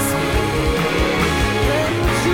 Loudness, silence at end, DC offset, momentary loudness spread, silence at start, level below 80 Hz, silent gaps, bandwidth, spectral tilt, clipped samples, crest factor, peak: -18 LUFS; 0 s; under 0.1%; 1 LU; 0 s; -26 dBFS; none; 17 kHz; -5 dB/octave; under 0.1%; 10 dB; -8 dBFS